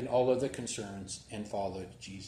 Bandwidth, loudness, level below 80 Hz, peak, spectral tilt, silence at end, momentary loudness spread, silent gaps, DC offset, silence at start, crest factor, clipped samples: 13.5 kHz; -35 LUFS; -62 dBFS; -16 dBFS; -4.5 dB/octave; 0 s; 14 LU; none; under 0.1%; 0 s; 18 dB; under 0.1%